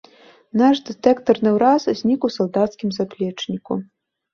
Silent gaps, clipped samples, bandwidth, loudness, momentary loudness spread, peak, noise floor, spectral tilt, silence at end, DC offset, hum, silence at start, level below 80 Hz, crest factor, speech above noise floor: none; under 0.1%; 7.2 kHz; -19 LUFS; 10 LU; -2 dBFS; -49 dBFS; -6.5 dB/octave; 0.5 s; under 0.1%; none; 0.55 s; -60 dBFS; 18 dB; 30 dB